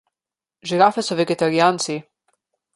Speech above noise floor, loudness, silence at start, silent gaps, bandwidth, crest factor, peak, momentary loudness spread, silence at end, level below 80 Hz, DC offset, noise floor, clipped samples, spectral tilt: 71 dB; -19 LUFS; 0.65 s; none; 11.5 kHz; 20 dB; -2 dBFS; 11 LU; 0.75 s; -68 dBFS; under 0.1%; -89 dBFS; under 0.1%; -4.5 dB/octave